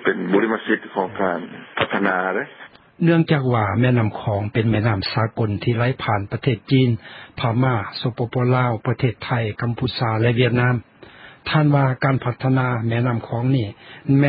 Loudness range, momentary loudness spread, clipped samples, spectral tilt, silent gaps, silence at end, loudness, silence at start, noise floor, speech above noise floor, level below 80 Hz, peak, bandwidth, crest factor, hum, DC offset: 2 LU; 7 LU; under 0.1%; -12 dB/octave; none; 0 s; -20 LUFS; 0 s; -44 dBFS; 24 dB; -48 dBFS; -2 dBFS; 5.2 kHz; 18 dB; none; under 0.1%